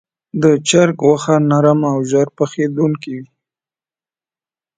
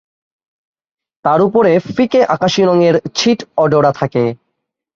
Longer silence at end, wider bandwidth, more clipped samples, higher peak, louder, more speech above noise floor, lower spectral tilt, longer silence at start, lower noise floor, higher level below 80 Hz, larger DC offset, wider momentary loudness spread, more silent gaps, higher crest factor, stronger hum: first, 1.55 s vs 0.6 s; first, 9.4 kHz vs 7.6 kHz; neither; about the same, 0 dBFS vs -2 dBFS; about the same, -14 LUFS vs -13 LUFS; first, over 76 dB vs 61 dB; about the same, -6 dB/octave vs -5.5 dB/octave; second, 0.35 s vs 1.25 s; first, under -90 dBFS vs -73 dBFS; second, -60 dBFS vs -54 dBFS; neither; first, 12 LU vs 5 LU; neither; about the same, 16 dB vs 12 dB; neither